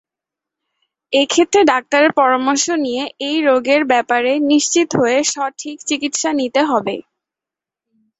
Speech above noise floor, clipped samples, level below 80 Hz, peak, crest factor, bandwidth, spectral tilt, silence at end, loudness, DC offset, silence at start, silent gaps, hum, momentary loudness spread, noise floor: 72 dB; under 0.1%; -62 dBFS; 0 dBFS; 16 dB; 8.4 kHz; -2.5 dB/octave; 1.2 s; -15 LUFS; under 0.1%; 1.1 s; none; none; 9 LU; -87 dBFS